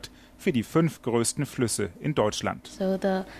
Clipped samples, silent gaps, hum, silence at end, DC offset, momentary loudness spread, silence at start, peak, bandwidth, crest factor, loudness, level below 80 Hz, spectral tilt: under 0.1%; none; none; 0 s; under 0.1%; 6 LU; 0.05 s; -10 dBFS; 15 kHz; 18 dB; -27 LUFS; -54 dBFS; -5 dB/octave